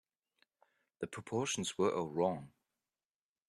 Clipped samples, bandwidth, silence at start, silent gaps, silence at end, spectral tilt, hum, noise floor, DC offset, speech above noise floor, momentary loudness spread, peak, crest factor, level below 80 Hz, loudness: under 0.1%; 12.5 kHz; 1 s; none; 1 s; -4 dB/octave; none; under -90 dBFS; under 0.1%; over 53 dB; 11 LU; -20 dBFS; 20 dB; -76 dBFS; -37 LUFS